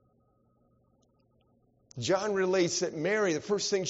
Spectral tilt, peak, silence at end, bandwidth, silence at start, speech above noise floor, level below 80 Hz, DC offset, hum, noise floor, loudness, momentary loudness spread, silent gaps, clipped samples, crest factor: -3.5 dB/octave; -14 dBFS; 0 s; 8 kHz; 1.95 s; 40 dB; -72 dBFS; under 0.1%; none; -69 dBFS; -29 LUFS; 5 LU; none; under 0.1%; 18 dB